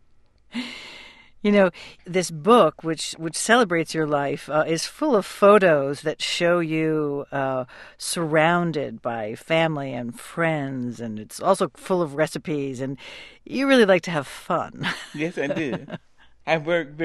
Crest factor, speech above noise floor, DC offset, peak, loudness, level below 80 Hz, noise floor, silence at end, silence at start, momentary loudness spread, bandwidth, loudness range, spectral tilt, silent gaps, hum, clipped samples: 20 dB; 33 dB; under 0.1%; -4 dBFS; -22 LUFS; -60 dBFS; -55 dBFS; 0 s; 0.55 s; 16 LU; 12.5 kHz; 5 LU; -5 dB/octave; none; none; under 0.1%